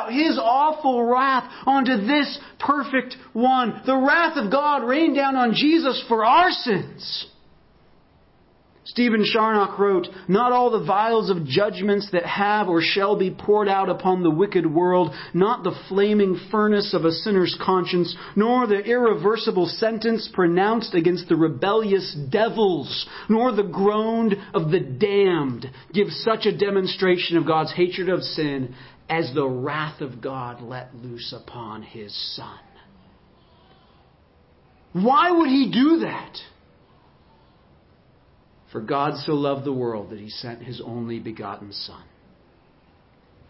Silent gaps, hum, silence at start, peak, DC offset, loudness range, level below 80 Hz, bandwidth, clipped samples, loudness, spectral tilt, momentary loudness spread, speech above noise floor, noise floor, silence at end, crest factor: none; none; 0 s; -4 dBFS; under 0.1%; 11 LU; -62 dBFS; 5.8 kHz; under 0.1%; -21 LUFS; -10 dB/octave; 15 LU; 35 dB; -56 dBFS; 1.5 s; 16 dB